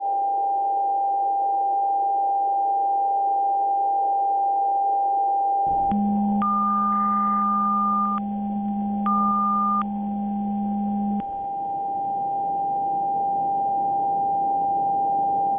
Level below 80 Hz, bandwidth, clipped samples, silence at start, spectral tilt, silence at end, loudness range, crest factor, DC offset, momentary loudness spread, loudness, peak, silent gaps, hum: -56 dBFS; 3.5 kHz; under 0.1%; 0 s; -11.5 dB/octave; 0 s; 4 LU; 8 dB; under 0.1%; 5 LU; -23 LUFS; -14 dBFS; none; none